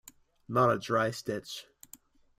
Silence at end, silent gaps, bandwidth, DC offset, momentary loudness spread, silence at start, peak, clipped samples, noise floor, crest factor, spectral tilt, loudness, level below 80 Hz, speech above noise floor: 0.75 s; none; 16 kHz; under 0.1%; 17 LU; 0.5 s; -14 dBFS; under 0.1%; -58 dBFS; 18 dB; -5.5 dB/octave; -30 LUFS; -68 dBFS; 28 dB